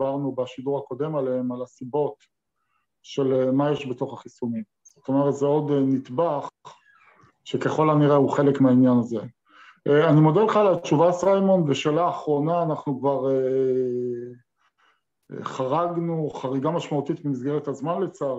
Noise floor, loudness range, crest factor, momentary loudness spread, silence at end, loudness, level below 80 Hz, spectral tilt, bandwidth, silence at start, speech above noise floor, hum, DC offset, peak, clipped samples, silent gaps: -75 dBFS; 8 LU; 16 dB; 14 LU; 0 s; -23 LUFS; -70 dBFS; -7.5 dB/octave; 8 kHz; 0 s; 52 dB; none; under 0.1%; -6 dBFS; under 0.1%; none